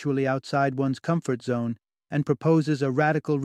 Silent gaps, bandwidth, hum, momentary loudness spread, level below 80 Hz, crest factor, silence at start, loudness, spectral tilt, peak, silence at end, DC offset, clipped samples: none; 10.5 kHz; none; 7 LU; -68 dBFS; 16 dB; 0 s; -25 LUFS; -7.5 dB/octave; -10 dBFS; 0 s; under 0.1%; under 0.1%